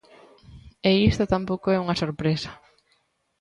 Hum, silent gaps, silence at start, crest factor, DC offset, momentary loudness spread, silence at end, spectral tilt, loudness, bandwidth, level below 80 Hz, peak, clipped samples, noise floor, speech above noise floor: none; none; 0.5 s; 20 dB; under 0.1%; 7 LU; 0.85 s; -6.5 dB/octave; -23 LUFS; 10.5 kHz; -44 dBFS; -6 dBFS; under 0.1%; -69 dBFS; 46 dB